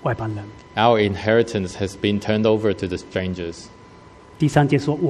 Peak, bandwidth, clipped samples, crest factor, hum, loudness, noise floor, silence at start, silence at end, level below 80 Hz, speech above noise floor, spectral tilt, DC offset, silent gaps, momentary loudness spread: -2 dBFS; 12 kHz; under 0.1%; 20 dB; none; -21 LUFS; -45 dBFS; 0 s; 0 s; -48 dBFS; 25 dB; -6.5 dB/octave; under 0.1%; none; 12 LU